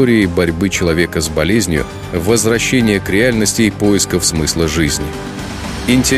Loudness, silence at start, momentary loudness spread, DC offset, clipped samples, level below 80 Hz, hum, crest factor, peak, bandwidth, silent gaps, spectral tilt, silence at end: -14 LUFS; 0 s; 9 LU; under 0.1%; under 0.1%; -30 dBFS; none; 14 dB; 0 dBFS; 15.5 kHz; none; -4 dB/octave; 0 s